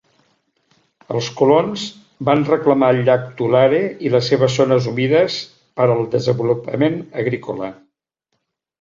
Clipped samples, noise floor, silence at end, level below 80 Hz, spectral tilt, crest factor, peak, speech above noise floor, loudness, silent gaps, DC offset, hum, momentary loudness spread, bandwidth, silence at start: under 0.1%; -74 dBFS; 1.05 s; -58 dBFS; -6.5 dB/octave; 16 dB; -2 dBFS; 57 dB; -17 LUFS; none; under 0.1%; none; 11 LU; 7.8 kHz; 1.1 s